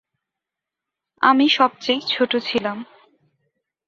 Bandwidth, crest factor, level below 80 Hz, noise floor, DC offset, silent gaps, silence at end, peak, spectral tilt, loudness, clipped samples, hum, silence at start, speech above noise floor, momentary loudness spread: 7.4 kHz; 20 dB; -68 dBFS; -86 dBFS; under 0.1%; none; 1.05 s; -2 dBFS; -4 dB/octave; -19 LUFS; under 0.1%; none; 1.2 s; 67 dB; 10 LU